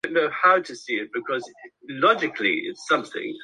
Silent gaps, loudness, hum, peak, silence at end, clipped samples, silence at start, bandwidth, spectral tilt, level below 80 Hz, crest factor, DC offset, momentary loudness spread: none; -23 LUFS; none; -6 dBFS; 0 s; under 0.1%; 0.05 s; 11 kHz; -3.5 dB/octave; -74 dBFS; 18 dB; under 0.1%; 11 LU